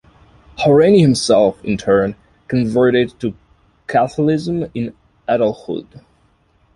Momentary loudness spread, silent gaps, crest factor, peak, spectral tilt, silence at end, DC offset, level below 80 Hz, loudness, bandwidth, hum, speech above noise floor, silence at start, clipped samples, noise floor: 16 LU; none; 16 dB; -2 dBFS; -6.5 dB/octave; 0.9 s; under 0.1%; -48 dBFS; -16 LUFS; 11.5 kHz; none; 42 dB; 0.6 s; under 0.1%; -57 dBFS